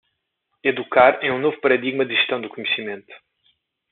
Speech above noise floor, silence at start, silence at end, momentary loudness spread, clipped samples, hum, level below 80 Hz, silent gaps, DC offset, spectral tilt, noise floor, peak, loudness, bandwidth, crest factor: 55 dB; 0.65 s; 0.75 s; 10 LU; under 0.1%; none; -68 dBFS; none; under 0.1%; -1 dB/octave; -75 dBFS; -2 dBFS; -19 LUFS; 4.3 kHz; 20 dB